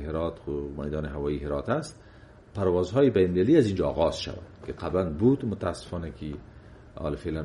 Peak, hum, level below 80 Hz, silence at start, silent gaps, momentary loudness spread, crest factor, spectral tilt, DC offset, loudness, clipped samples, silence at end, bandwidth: -8 dBFS; none; -44 dBFS; 0 s; none; 17 LU; 18 dB; -7.5 dB/octave; under 0.1%; -27 LUFS; under 0.1%; 0 s; 11.5 kHz